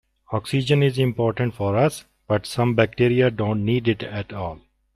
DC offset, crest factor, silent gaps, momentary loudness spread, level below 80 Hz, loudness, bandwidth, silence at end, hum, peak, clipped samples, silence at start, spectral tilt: under 0.1%; 18 dB; none; 11 LU; -52 dBFS; -22 LUFS; 13.5 kHz; 0.4 s; none; -4 dBFS; under 0.1%; 0.3 s; -7 dB/octave